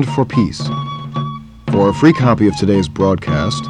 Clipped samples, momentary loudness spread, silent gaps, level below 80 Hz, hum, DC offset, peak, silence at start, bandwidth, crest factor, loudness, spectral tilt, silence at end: under 0.1%; 12 LU; none; -38 dBFS; none; under 0.1%; 0 dBFS; 0 s; 10.5 kHz; 14 dB; -15 LUFS; -7 dB/octave; 0 s